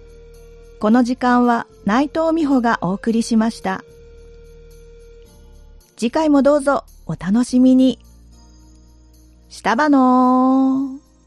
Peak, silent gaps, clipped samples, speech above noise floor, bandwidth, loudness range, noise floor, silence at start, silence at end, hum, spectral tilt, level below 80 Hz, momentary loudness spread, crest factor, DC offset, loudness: -2 dBFS; none; under 0.1%; 32 dB; 11.5 kHz; 5 LU; -47 dBFS; 0.8 s; 0.3 s; none; -6 dB/octave; -46 dBFS; 12 LU; 16 dB; under 0.1%; -17 LUFS